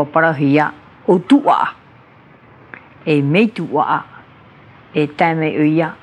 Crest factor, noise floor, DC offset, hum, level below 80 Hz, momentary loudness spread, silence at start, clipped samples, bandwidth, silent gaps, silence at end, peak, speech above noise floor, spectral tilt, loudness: 16 dB; -45 dBFS; under 0.1%; none; -64 dBFS; 9 LU; 0 s; under 0.1%; 9.8 kHz; none; 0.1 s; 0 dBFS; 30 dB; -8 dB/octave; -16 LUFS